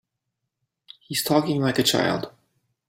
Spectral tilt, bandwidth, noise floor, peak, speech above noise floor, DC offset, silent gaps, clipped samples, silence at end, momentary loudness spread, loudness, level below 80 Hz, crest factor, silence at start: -4 dB/octave; 16.5 kHz; -81 dBFS; -4 dBFS; 59 dB; under 0.1%; none; under 0.1%; 0.6 s; 9 LU; -22 LUFS; -62 dBFS; 20 dB; 1.1 s